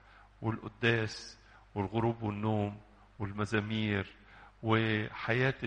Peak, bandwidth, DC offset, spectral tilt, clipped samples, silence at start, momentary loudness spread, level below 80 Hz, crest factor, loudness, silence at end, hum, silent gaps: -14 dBFS; 9.4 kHz; under 0.1%; -6.5 dB/octave; under 0.1%; 0.4 s; 13 LU; -60 dBFS; 20 dB; -34 LUFS; 0 s; none; none